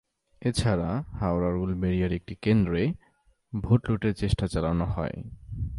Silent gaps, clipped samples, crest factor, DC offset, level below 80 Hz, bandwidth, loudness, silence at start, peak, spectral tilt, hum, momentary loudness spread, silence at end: none; under 0.1%; 20 dB; under 0.1%; -40 dBFS; 11.5 kHz; -28 LUFS; 0.4 s; -8 dBFS; -7.5 dB/octave; none; 11 LU; 0 s